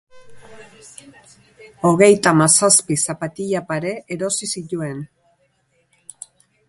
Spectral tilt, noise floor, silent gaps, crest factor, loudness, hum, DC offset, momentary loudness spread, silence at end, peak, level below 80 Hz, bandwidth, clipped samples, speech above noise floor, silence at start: -3.5 dB/octave; -64 dBFS; none; 20 dB; -17 LUFS; none; under 0.1%; 18 LU; 1.65 s; 0 dBFS; -60 dBFS; 11.5 kHz; under 0.1%; 46 dB; 0.15 s